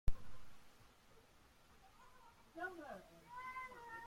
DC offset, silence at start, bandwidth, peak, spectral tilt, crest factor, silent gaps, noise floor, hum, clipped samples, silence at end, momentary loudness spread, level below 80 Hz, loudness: under 0.1%; 0.05 s; 15 kHz; -22 dBFS; -5.5 dB/octave; 22 dB; none; -68 dBFS; none; under 0.1%; 0 s; 19 LU; -52 dBFS; -52 LUFS